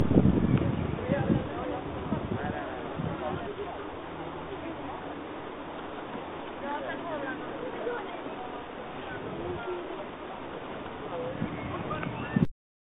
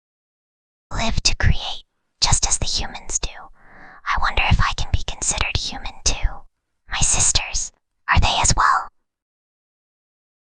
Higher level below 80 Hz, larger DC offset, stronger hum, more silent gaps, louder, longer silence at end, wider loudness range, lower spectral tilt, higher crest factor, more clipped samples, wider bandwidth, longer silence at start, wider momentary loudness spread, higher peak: second, -48 dBFS vs -26 dBFS; neither; neither; neither; second, -33 LUFS vs -20 LUFS; second, 0.4 s vs 1.6 s; first, 6 LU vs 3 LU; first, -6.5 dB/octave vs -2 dB/octave; first, 26 dB vs 20 dB; neither; second, 4 kHz vs 10 kHz; second, 0 s vs 0.9 s; second, 11 LU vs 14 LU; second, -6 dBFS vs -2 dBFS